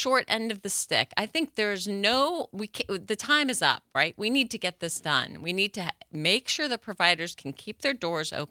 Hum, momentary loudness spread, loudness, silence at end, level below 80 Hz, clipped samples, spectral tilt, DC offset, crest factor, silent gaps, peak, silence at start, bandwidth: none; 9 LU; -27 LUFS; 0.05 s; -68 dBFS; under 0.1%; -2.5 dB/octave; under 0.1%; 24 dB; none; -6 dBFS; 0 s; 18.5 kHz